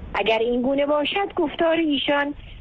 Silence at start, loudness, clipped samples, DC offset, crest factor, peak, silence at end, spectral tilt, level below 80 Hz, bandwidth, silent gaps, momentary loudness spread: 0 s; -22 LUFS; under 0.1%; under 0.1%; 12 dB; -10 dBFS; 0 s; -6 dB/octave; -46 dBFS; 6.6 kHz; none; 3 LU